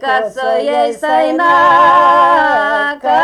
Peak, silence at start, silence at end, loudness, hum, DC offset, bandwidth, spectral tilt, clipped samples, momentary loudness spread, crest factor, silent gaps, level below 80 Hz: -2 dBFS; 0 s; 0 s; -10 LUFS; none; under 0.1%; 12 kHz; -4 dB/octave; under 0.1%; 8 LU; 10 dB; none; -54 dBFS